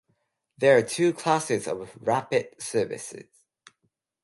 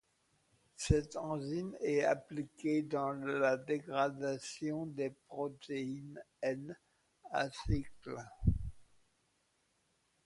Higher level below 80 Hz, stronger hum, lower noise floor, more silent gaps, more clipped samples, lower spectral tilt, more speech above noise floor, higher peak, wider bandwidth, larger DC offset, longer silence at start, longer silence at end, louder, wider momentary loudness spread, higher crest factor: second, -70 dBFS vs -50 dBFS; neither; about the same, -76 dBFS vs -78 dBFS; neither; neither; second, -4.5 dB/octave vs -6 dB/octave; first, 51 dB vs 41 dB; first, -6 dBFS vs -18 dBFS; about the same, 11.5 kHz vs 11.5 kHz; neither; second, 0.6 s vs 0.8 s; second, 1 s vs 1.4 s; first, -25 LUFS vs -38 LUFS; about the same, 14 LU vs 12 LU; about the same, 20 dB vs 20 dB